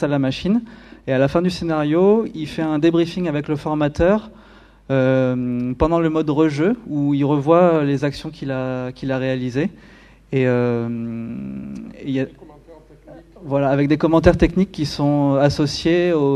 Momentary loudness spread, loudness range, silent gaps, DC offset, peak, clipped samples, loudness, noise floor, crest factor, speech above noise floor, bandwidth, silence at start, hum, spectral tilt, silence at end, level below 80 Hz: 11 LU; 6 LU; none; under 0.1%; 0 dBFS; under 0.1%; -19 LUFS; -45 dBFS; 18 dB; 26 dB; 11.5 kHz; 0 s; none; -7.5 dB/octave; 0 s; -38 dBFS